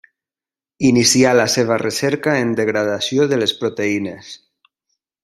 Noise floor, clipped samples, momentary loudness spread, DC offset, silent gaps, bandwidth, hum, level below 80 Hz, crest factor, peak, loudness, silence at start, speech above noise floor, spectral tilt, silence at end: under -90 dBFS; under 0.1%; 9 LU; under 0.1%; none; 15.5 kHz; none; -56 dBFS; 18 dB; 0 dBFS; -16 LUFS; 0.8 s; over 74 dB; -3.5 dB/octave; 0.9 s